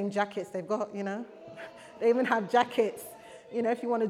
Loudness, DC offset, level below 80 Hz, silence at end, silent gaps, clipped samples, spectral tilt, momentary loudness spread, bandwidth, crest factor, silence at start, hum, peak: -30 LUFS; under 0.1%; -80 dBFS; 0 s; none; under 0.1%; -5.5 dB/octave; 19 LU; 15.5 kHz; 18 dB; 0 s; none; -12 dBFS